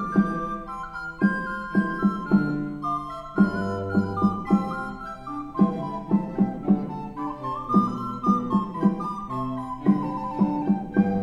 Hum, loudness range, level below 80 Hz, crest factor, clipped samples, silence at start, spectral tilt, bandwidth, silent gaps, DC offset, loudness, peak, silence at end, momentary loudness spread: none; 1 LU; -48 dBFS; 18 dB; under 0.1%; 0 s; -9 dB/octave; 7 kHz; none; under 0.1%; -25 LUFS; -8 dBFS; 0 s; 9 LU